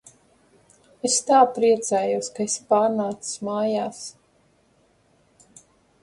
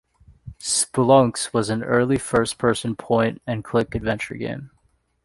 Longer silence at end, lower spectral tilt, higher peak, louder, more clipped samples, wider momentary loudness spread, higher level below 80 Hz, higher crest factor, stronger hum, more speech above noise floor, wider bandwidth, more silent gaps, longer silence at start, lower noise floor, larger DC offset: first, 1.95 s vs 0.55 s; second, -3 dB/octave vs -4.5 dB/octave; about the same, -4 dBFS vs -2 dBFS; about the same, -22 LUFS vs -21 LUFS; neither; about the same, 13 LU vs 13 LU; second, -70 dBFS vs -48 dBFS; about the same, 20 dB vs 20 dB; neither; about the same, 40 dB vs 43 dB; about the same, 11.5 kHz vs 11.5 kHz; neither; first, 1.05 s vs 0.45 s; about the same, -62 dBFS vs -64 dBFS; neither